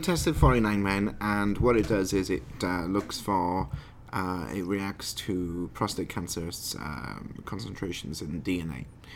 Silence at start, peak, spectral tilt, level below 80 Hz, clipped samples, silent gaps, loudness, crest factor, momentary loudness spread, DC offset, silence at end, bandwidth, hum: 0 s; -6 dBFS; -5.5 dB/octave; -40 dBFS; under 0.1%; none; -29 LUFS; 22 dB; 13 LU; under 0.1%; 0 s; 17.5 kHz; none